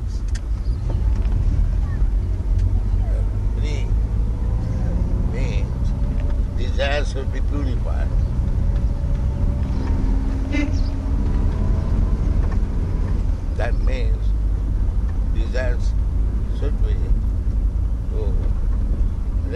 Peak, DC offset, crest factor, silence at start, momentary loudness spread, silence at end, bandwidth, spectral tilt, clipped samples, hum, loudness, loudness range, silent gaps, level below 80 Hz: -6 dBFS; under 0.1%; 12 dB; 0 s; 3 LU; 0 s; 7 kHz; -7.5 dB/octave; under 0.1%; none; -23 LUFS; 1 LU; none; -20 dBFS